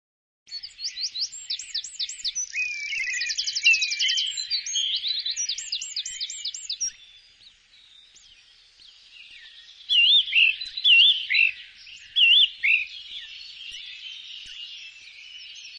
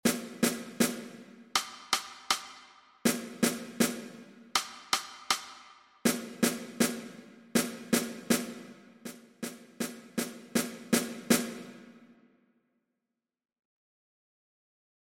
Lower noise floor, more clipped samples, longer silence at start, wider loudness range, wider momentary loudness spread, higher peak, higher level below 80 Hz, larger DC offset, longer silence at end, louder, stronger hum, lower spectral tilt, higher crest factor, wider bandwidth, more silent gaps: second, -55 dBFS vs -88 dBFS; neither; first, 0.5 s vs 0.05 s; first, 14 LU vs 3 LU; first, 22 LU vs 17 LU; first, -6 dBFS vs -10 dBFS; about the same, -68 dBFS vs -70 dBFS; neither; second, 0 s vs 3 s; first, -21 LUFS vs -32 LUFS; neither; second, 6.5 dB/octave vs -3 dB/octave; about the same, 20 dB vs 24 dB; second, 10 kHz vs 16.5 kHz; neither